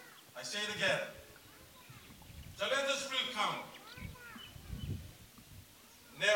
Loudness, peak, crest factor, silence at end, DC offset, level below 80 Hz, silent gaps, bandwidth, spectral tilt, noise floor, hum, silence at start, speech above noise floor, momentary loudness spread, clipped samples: -37 LUFS; -18 dBFS; 22 dB; 0 s; under 0.1%; -60 dBFS; none; 17 kHz; -2.5 dB/octave; -59 dBFS; none; 0 s; 23 dB; 22 LU; under 0.1%